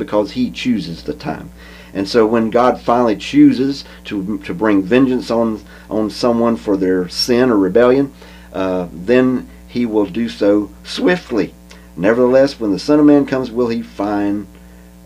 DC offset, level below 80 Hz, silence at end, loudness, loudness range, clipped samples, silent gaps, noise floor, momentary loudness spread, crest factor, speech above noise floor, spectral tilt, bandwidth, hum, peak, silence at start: under 0.1%; -42 dBFS; 0.4 s; -16 LUFS; 2 LU; under 0.1%; none; -39 dBFS; 13 LU; 16 dB; 25 dB; -6 dB/octave; 14.5 kHz; none; 0 dBFS; 0 s